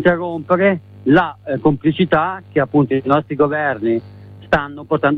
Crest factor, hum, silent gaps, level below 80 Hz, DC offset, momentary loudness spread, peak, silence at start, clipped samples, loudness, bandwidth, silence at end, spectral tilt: 14 dB; none; none; -44 dBFS; under 0.1%; 6 LU; -2 dBFS; 0 s; under 0.1%; -17 LUFS; 6 kHz; 0 s; -9 dB/octave